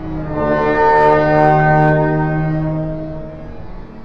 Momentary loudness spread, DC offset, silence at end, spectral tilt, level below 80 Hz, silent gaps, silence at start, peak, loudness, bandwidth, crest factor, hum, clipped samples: 21 LU; 2%; 0 s; -9 dB/octave; -34 dBFS; none; 0 s; 0 dBFS; -14 LUFS; 6 kHz; 14 dB; none; under 0.1%